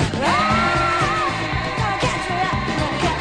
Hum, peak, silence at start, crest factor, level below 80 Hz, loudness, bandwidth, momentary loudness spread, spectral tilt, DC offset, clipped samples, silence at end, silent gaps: none; -6 dBFS; 0 s; 14 dB; -36 dBFS; -19 LUFS; 10.5 kHz; 5 LU; -5 dB/octave; under 0.1%; under 0.1%; 0 s; none